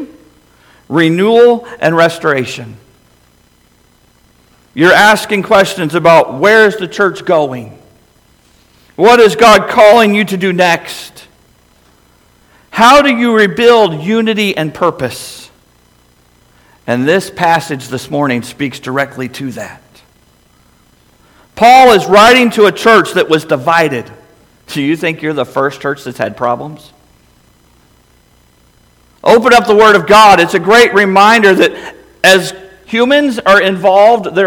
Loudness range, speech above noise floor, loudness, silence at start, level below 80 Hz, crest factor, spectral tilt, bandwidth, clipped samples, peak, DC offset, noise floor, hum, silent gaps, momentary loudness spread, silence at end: 10 LU; 40 dB; -9 LUFS; 0 s; -46 dBFS; 10 dB; -4.5 dB/octave; 19 kHz; 1%; 0 dBFS; under 0.1%; -49 dBFS; none; none; 15 LU; 0 s